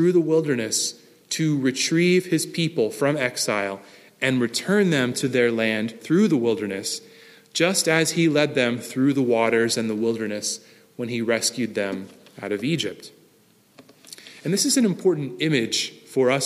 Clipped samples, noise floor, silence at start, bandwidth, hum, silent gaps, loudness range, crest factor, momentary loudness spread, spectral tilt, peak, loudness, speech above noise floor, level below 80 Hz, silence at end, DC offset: under 0.1%; -58 dBFS; 0 s; 15.5 kHz; none; none; 5 LU; 18 dB; 11 LU; -4 dB/octave; -4 dBFS; -22 LUFS; 36 dB; -72 dBFS; 0 s; under 0.1%